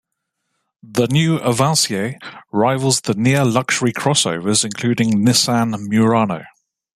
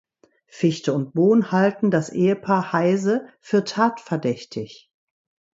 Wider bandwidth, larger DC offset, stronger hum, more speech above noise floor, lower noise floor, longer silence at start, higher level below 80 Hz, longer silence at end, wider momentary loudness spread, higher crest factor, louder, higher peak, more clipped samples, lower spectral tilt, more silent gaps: first, 15 kHz vs 7.8 kHz; neither; neither; first, 58 dB vs 35 dB; first, -75 dBFS vs -56 dBFS; first, 0.85 s vs 0.55 s; first, -56 dBFS vs -68 dBFS; second, 0.5 s vs 0.85 s; about the same, 8 LU vs 9 LU; about the same, 16 dB vs 16 dB; first, -17 LUFS vs -21 LUFS; about the same, -2 dBFS vs -4 dBFS; neither; second, -4.5 dB/octave vs -7 dB/octave; neither